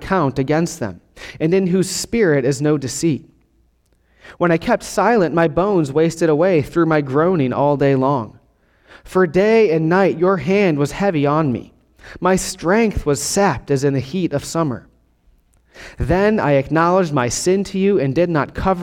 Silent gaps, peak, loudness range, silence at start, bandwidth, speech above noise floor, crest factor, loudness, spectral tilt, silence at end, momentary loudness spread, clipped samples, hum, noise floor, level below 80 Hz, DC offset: none; -2 dBFS; 3 LU; 0 s; 16.5 kHz; 42 dB; 14 dB; -17 LUFS; -6 dB/octave; 0 s; 7 LU; under 0.1%; none; -59 dBFS; -40 dBFS; under 0.1%